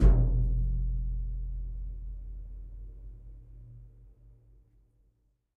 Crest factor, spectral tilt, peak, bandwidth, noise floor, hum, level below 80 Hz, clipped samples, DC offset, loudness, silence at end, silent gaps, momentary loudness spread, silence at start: 20 dB; -10 dB/octave; -10 dBFS; 2 kHz; -71 dBFS; none; -32 dBFS; under 0.1%; under 0.1%; -33 LUFS; 1.5 s; none; 23 LU; 0 s